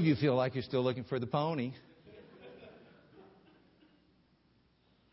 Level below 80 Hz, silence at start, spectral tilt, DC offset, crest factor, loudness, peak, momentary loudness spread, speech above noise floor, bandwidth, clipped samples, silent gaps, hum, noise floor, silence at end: -68 dBFS; 0 s; -6 dB/octave; under 0.1%; 20 dB; -33 LUFS; -18 dBFS; 26 LU; 38 dB; 5.6 kHz; under 0.1%; none; none; -70 dBFS; 1.9 s